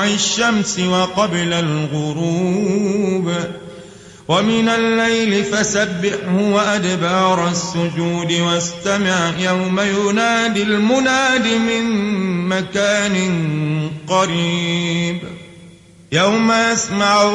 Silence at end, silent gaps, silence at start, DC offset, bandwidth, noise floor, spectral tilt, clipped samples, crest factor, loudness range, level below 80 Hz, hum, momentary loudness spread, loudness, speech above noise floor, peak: 0 s; none; 0 s; under 0.1%; 11 kHz; -42 dBFS; -4 dB/octave; under 0.1%; 14 dB; 3 LU; -52 dBFS; none; 6 LU; -16 LUFS; 26 dB; -2 dBFS